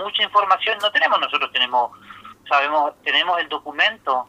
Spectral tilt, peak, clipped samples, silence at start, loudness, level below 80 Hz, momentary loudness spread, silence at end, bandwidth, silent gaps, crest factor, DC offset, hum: -1.5 dB/octave; -2 dBFS; under 0.1%; 0 s; -19 LUFS; -68 dBFS; 5 LU; 0.05 s; 15.5 kHz; none; 18 dB; under 0.1%; none